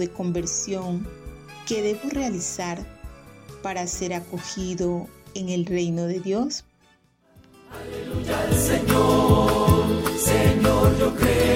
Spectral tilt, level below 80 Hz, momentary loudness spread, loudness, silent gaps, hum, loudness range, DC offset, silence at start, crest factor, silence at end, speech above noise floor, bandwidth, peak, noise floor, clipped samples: -5 dB/octave; -36 dBFS; 17 LU; -23 LUFS; none; none; 10 LU; under 0.1%; 0 s; 18 dB; 0 s; 38 dB; 16 kHz; -6 dBFS; -60 dBFS; under 0.1%